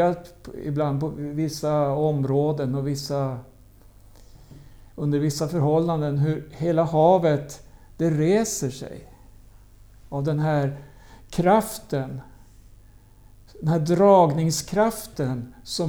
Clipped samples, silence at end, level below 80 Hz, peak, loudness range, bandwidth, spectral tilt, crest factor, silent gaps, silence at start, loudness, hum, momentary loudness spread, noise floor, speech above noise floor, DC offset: under 0.1%; 0 s; -50 dBFS; -6 dBFS; 5 LU; over 20 kHz; -6.5 dB/octave; 18 dB; none; 0 s; -23 LUFS; none; 16 LU; -50 dBFS; 28 dB; under 0.1%